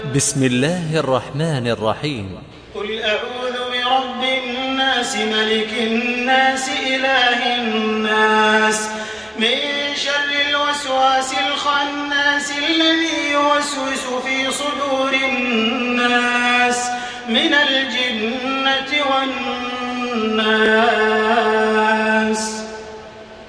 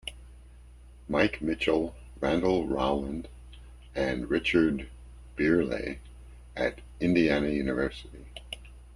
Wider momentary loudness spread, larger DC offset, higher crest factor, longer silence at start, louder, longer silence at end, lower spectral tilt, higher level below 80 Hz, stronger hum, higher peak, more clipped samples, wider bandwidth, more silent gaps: second, 9 LU vs 19 LU; neither; about the same, 16 dB vs 20 dB; about the same, 0 s vs 0.05 s; first, -17 LUFS vs -28 LUFS; about the same, 0 s vs 0 s; second, -3 dB/octave vs -6.5 dB/octave; second, -52 dBFS vs -46 dBFS; neither; first, -2 dBFS vs -10 dBFS; neither; about the same, 10.5 kHz vs 11 kHz; neither